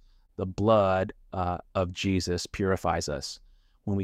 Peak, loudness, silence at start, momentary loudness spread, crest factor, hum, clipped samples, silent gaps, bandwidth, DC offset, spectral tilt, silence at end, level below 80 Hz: -10 dBFS; -28 LUFS; 0.4 s; 15 LU; 18 dB; none; under 0.1%; none; 14.5 kHz; under 0.1%; -5.5 dB/octave; 0 s; -50 dBFS